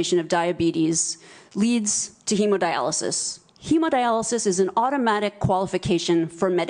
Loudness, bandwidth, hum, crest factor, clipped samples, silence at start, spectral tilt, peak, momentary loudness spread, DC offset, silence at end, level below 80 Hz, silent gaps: -22 LUFS; 10.5 kHz; none; 14 dB; under 0.1%; 0 s; -4 dB/octave; -8 dBFS; 4 LU; under 0.1%; 0 s; -54 dBFS; none